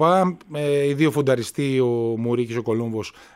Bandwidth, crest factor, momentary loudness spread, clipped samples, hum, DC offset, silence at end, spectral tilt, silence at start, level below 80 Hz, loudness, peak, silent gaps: 16 kHz; 16 dB; 6 LU; under 0.1%; none; under 0.1%; 0.25 s; -6.5 dB/octave; 0 s; -62 dBFS; -22 LUFS; -6 dBFS; none